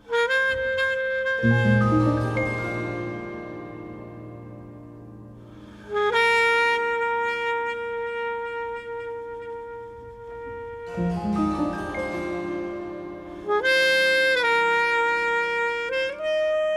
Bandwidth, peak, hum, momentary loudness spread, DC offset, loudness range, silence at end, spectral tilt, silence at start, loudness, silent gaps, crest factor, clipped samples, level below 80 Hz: 13.5 kHz; -8 dBFS; none; 20 LU; under 0.1%; 11 LU; 0 s; -5.5 dB/octave; 0.05 s; -23 LUFS; none; 18 dB; under 0.1%; -50 dBFS